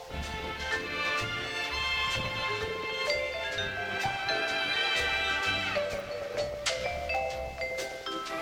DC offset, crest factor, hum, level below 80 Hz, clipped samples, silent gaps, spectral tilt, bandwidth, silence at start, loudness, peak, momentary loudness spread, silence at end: under 0.1%; 18 dB; none; -50 dBFS; under 0.1%; none; -2.5 dB/octave; 17 kHz; 0 s; -31 LUFS; -14 dBFS; 8 LU; 0 s